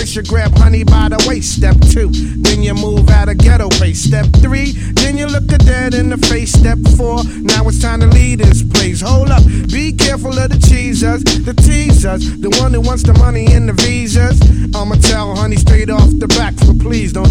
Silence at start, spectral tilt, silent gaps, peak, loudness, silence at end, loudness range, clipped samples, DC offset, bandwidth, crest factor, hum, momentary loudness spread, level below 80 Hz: 0 s; -5 dB/octave; none; 0 dBFS; -11 LUFS; 0 s; 1 LU; 0.6%; under 0.1%; 13 kHz; 8 dB; none; 5 LU; -12 dBFS